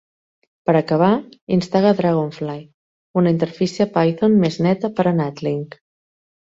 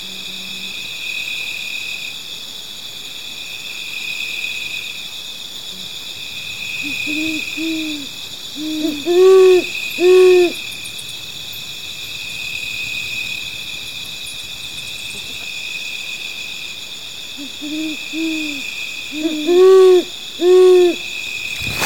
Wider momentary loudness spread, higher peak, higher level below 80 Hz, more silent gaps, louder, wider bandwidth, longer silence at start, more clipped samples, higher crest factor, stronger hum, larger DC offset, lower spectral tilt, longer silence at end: second, 10 LU vs 17 LU; about the same, -2 dBFS vs -4 dBFS; about the same, -58 dBFS vs -54 dBFS; first, 1.41-1.47 s, 2.74-3.14 s vs none; about the same, -19 LUFS vs -18 LUFS; second, 7.8 kHz vs 17 kHz; first, 0.65 s vs 0 s; neither; about the same, 16 dB vs 14 dB; neither; second, under 0.1% vs 1%; first, -8 dB/octave vs -3 dB/octave; first, 0.85 s vs 0 s